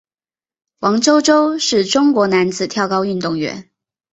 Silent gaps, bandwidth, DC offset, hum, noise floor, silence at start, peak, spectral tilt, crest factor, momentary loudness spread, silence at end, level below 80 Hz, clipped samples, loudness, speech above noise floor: none; 8.2 kHz; under 0.1%; none; under -90 dBFS; 0.8 s; 0 dBFS; -4 dB/octave; 16 dB; 9 LU; 0.5 s; -58 dBFS; under 0.1%; -15 LUFS; over 75 dB